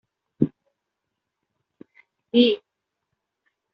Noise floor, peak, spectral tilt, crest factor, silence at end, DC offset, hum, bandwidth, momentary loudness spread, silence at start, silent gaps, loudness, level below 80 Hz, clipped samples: -82 dBFS; -4 dBFS; -5 dB/octave; 24 dB; 1.15 s; under 0.1%; none; 5.4 kHz; 8 LU; 0.4 s; none; -23 LUFS; -64 dBFS; under 0.1%